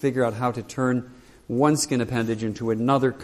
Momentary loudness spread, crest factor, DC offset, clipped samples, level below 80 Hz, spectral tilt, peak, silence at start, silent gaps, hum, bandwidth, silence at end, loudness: 7 LU; 18 dB; under 0.1%; under 0.1%; -56 dBFS; -5.5 dB/octave; -6 dBFS; 0 s; none; none; 14 kHz; 0 s; -24 LUFS